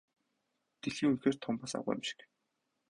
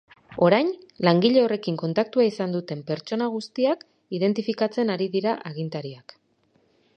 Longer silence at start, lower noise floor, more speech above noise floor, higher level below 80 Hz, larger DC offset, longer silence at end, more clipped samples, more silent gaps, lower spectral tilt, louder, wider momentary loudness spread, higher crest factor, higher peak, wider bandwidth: first, 0.85 s vs 0.3 s; first, -83 dBFS vs -65 dBFS; first, 49 dB vs 42 dB; about the same, -72 dBFS vs -70 dBFS; neither; second, 0.75 s vs 1 s; neither; neither; second, -5 dB/octave vs -7 dB/octave; second, -36 LUFS vs -24 LUFS; about the same, 11 LU vs 12 LU; about the same, 22 dB vs 22 dB; second, -16 dBFS vs -2 dBFS; first, 11 kHz vs 8.8 kHz